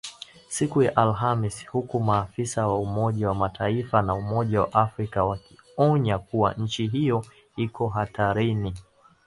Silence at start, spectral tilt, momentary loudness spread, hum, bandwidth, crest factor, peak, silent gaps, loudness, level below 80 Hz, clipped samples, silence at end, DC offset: 0.05 s; -6.5 dB/octave; 10 LU; none; 11.5 kHz; 22 dB; -4 dBFS; none; -25 LUFS; -48 dBFS; under 0.1%; 0.45 s; under 0.1%